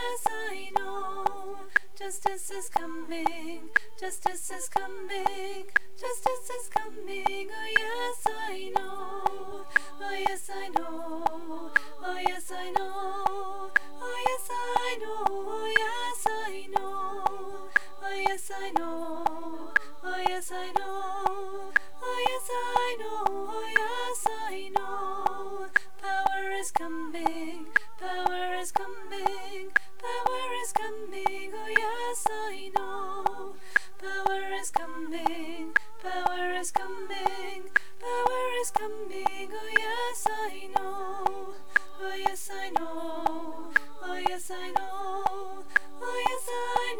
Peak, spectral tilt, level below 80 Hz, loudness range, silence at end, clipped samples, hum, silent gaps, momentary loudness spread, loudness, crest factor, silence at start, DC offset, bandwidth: -8 dBFS; -2 dB/octave; -64 dBFS; 2 LU; 0 s; under 0.1%; none; none; 8 LU; -31 LUFS; 22 dB; 0 s; 2%; over 20 kHz